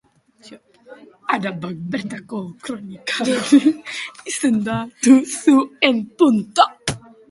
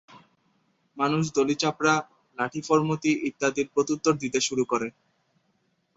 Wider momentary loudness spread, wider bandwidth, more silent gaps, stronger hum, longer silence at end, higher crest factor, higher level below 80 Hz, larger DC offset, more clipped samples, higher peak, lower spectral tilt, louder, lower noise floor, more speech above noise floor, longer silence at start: first, 15 LU vs 7 LU; first, 11.5 kHz vs 8 kHz; neither; neither; second, 0.3 s vs 1.05 s; about the same, 20 dB vs 20 dB; first, -56 dBFS vs -66 dBFS; neither; neither; first, 0 dBFS vs -8 dBFS; about the same, -4 dB/octave vs -4.5 dB/octave; first, -18 LUFS vs -26 LUFS; second, -44 dBFS vs -71 dBFS; second, 26 dB vs 46 dB; first, 0.45 s vs 0.1 s